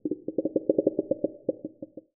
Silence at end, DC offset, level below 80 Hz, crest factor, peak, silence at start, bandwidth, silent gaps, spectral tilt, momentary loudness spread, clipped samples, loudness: 0.15 s; under 0.1%; -72 dBFS; 22 dB; -8 dBFS; 0.05 s; 0.9 kHz; none; -5.5 dB/octave; 15 LU; under 0.1%; -29 LUFS